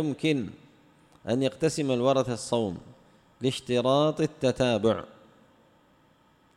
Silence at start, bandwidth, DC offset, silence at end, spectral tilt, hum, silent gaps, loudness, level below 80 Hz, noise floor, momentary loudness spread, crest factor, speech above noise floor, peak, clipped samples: 0 s; 13 kHz; under 0.1%; 1.5 s; -5.5 dB/octave; none; none; -27 LUFS; -60 dBFS; -62 dBFS; 9 LU; 18 dB; 36 dB; -10 dBFS; under 0.1%